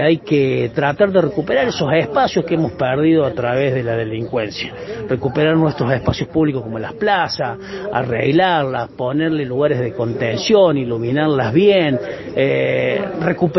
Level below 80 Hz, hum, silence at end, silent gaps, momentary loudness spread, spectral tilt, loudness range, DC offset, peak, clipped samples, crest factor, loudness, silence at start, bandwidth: -44 dBFS; none; 0 s; none; 8 LU; -7 dB/octave; 3 LU; under 0.1%; -2 dBFS; under 0.1%; 16 dB; -17 LUFS; 0 s; 6.2 kHz